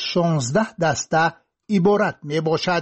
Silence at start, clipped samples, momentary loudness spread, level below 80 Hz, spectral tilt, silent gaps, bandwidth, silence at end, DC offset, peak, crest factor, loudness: 0 s; under 0.1%; 5 LU; -56 dBFS; -5 dB/octave; none; 8.4 kHz; 0 s; under 0.1%; -8 dBFS; 14 dB; -20 LUFS